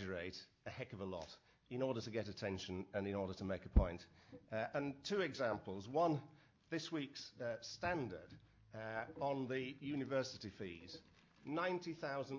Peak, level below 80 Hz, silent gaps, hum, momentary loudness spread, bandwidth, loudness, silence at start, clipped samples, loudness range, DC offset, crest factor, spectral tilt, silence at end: -22 dBFS; -50 dBFS; none; none; 16 LU; 7.6 kHz; -44 LUFS; 0 s; under 0.1%; 4 LU; under 0.1%; 22 dB; -6 dB/octave; 0 s